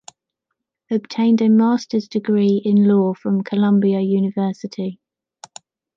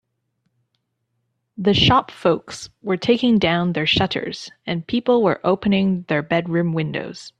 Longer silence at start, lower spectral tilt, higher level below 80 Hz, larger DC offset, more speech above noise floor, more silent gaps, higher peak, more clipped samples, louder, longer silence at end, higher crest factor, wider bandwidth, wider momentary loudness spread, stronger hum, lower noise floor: second, 0.9 s vs 1.6 s; first, -8 dB/octave vs -6 dB/octave; second, -68 dBFS vs -48 dBFS; neither; first, 62 dB vs 54 dB; neither; second, -6 dBFS vs -2 dBFS; neither; about the same, -18 LUFS vs -19 LUFS; first, 1.05 s vs 0.1 s; second, 12 dB vs 18 dB; second, 7.6 kHz vs 9.8 kHz; about the same, 10 LU vs 11 LU; neither; first, -79 dBFS vs -73 dBFS